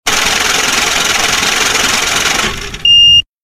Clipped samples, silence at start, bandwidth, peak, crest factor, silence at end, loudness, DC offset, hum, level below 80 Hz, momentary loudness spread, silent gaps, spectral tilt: under 0.1%; 0.05 s; 16 kHz; 0 dBFS; 12 dB; 0.2 s; -8 LUFS; under 0.1%; none; -34 dBFS; 8 LU; none; 0 dB/octave